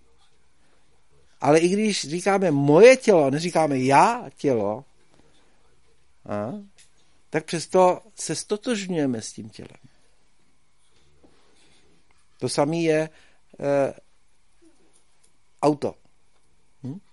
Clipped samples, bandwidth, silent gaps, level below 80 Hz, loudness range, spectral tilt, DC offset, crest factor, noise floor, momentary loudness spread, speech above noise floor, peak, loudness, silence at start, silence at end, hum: under 0.1%; 11.5 kHz; none; -66 dBFS; 13 LU; -5 dB/octave; 0.2%; 22 dB; -67 dBFS; 16 LU; 46 dB; -2 dBFS; -22 LUFS; 1.4 s; 0.15 s; none